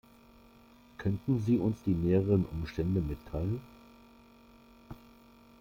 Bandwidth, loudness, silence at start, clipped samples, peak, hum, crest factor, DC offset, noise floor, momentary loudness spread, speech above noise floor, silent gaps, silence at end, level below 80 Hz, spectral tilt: 16 kHz; -32 LUFS; 1 s; under 0.1%; -16 dBFS; none; 18 dB; under 0.1%; -58 dBFS; 24 LU; 28 dB; none; 0.65 s; -50 dBFS; -9.5 dB/octave